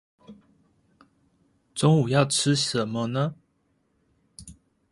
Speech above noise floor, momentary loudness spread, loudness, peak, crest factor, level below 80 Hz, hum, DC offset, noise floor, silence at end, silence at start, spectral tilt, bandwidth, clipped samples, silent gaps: 47 dB; 25 LU; -23 LUFS; -8 dBFS; 20 dB; -62 dBFS; none; under 0.1%; -70 dBFS; 0.4 s; 0.3 s; -5 dB/octave; 11.5 kHz; under 0.1%; none